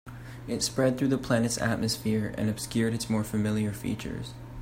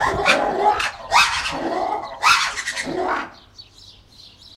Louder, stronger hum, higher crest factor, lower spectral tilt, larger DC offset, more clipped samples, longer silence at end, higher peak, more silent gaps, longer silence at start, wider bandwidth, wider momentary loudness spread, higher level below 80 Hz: second, -29 LUFS vs -19 LUFS; neither; about the same, 18 dB vs 20 dB; first, -5 dB/octave vs -2 dB/octave; neither; neither; about the same, 0 s vs 0 s; second, -12 dBFS vs -2 dBFS; neither; about the same, 0.05 s vs 0 s; about the same, 16 kHz vs 16 kHz; about the same, 11 LU vs 9 LU; about the same, -50 dBFS vs -46 dBFS